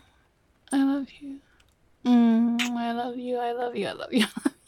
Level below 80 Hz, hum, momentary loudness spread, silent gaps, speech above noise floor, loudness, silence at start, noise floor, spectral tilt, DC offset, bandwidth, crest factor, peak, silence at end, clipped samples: -68 dBFS; none; 14 LU; none; 39 dB; -26 LUFS; 0.7 s; -64 dBFS; -4.5 dB/octave; under 0.1%; 14.5 kHz; 16 dB; -10 dBFS; 0.15 s; under 0.1%